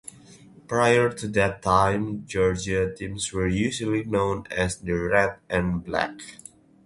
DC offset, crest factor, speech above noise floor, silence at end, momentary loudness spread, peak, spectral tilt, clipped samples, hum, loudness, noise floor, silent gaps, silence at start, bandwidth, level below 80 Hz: under 0.1%; 20 dB; 26 dB; 0.5 s; 9 LU; -4 dBFS; -5 dB/octave; under 0.1%; none; -24 LUFS; -50 dBFS; none; 0.7 s; 11.5 kHz; -44 dBFS